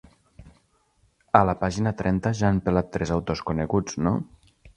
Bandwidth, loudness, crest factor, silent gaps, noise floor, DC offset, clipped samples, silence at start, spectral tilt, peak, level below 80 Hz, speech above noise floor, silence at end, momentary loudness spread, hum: 10.5 kHz; -24 LUFS; 26 dB; none; -65 dBFS; under 0.1%; under 0.1%; 0.4 s; -7 dB/octave; 0 dBFS; -42 dBFS; 42 dB; 0.1 s; 7 LU; none